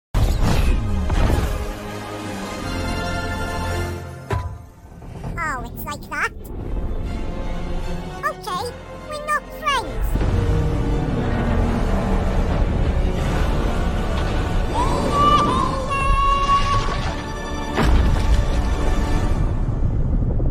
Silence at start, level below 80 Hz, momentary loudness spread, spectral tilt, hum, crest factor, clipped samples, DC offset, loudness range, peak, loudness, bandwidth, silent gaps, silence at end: 0.15 s; -22 dBFS; 11 LU; -6 dB/octave; none; 16 dB; under 0.1%; under 0.1%; 8 LU; -4 dBFS; -22 LUFS; 17 kHz; none; 0 s